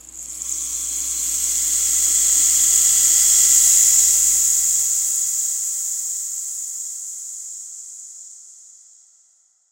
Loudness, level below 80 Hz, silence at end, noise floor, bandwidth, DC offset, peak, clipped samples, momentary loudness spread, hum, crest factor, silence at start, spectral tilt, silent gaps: -15 LUFS; -52 dBFS; 1.2 s; -58 dBFS; 16 kHz; under 0.1%; 0 dBFS; under 0.1%; 19 LU; none; 20 dB; 0.05 s; 3 dB/octave; none